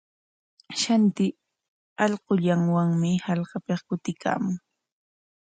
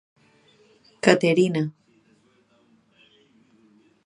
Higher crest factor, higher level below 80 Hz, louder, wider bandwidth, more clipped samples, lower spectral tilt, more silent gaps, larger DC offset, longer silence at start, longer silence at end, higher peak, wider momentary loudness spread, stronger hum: second, 18 dB vs 26 dB; about the same, -68 dBFS vs -70 dBFS; second, -25 LUFS vs -21 LUFS; second, 9.4 kHz vs 11 kHz; neither; about the same, -6 dB/octave vs -5.5 dB/octave; first, 1.68-1.96 s vs none; neither; second, 0.7 s vs 1.05 s; second, 0.85 s vs 2.35 s; second, -8 dBFS vs 0 dBFS; about the same, 9 LU vs 10 LU; neither